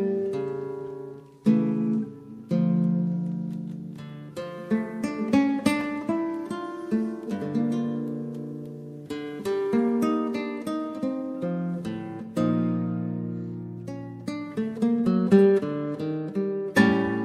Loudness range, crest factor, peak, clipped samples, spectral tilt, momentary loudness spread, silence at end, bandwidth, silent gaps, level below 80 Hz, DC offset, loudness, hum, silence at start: 5 LU; 20 dB; -6 dBFS; under 0.1%; -7.5 dB/octave; 15 LU; 0 s; 13.5 kHz; none; -66 dBFS; under 0.1%; -27 LUFS; none; 0 s